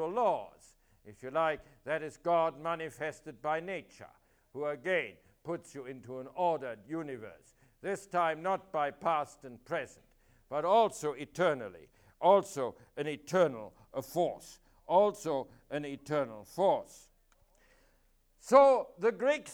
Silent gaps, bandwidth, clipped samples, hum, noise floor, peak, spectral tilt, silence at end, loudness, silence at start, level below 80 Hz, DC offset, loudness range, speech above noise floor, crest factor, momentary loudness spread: none; 17 kHz; under 0.1%; none; -69 dBFS; -10 dBFS; -5 dB/octave; 0 s; -32 LUFS; 0 s; -70 dBFS; under 0.1%; 7 LU; 37 dB; 24 dB; 17 LU